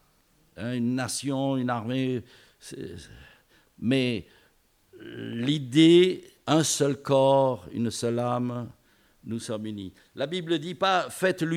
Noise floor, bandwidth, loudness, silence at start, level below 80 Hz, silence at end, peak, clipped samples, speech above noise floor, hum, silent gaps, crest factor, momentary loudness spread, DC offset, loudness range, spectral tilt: -64 dBFS; 15.5 kHz; -26 LUFS; 0.55 s; -66 dBFS; 0 s; -8 dBFS; under 0.1%; 39 dB; none; none; 18 dB; 19 LU; under 0.1%; 9 LU; -5 dB/octave